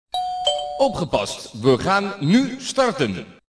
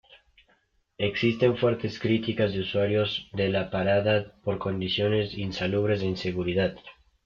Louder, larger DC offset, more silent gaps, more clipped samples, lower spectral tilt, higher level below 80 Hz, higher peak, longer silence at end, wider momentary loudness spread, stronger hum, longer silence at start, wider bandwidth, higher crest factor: first, -21 LUFS vs -27 LUFS; neither; neither; neither; second, -5 dB/octave vs -7 dB/octave; first, -50 dBFS vs -56 dBFS; first, -4 dBFS vs -10 dBFS; second, 0.2 s vs 0.35 s; about the same, 6 LU vs 7 LU; neither; second, 0.15 s vs 1 s; first, 11 kHz vs 7.2 kHz; about the same, 16 dB vs 18 dB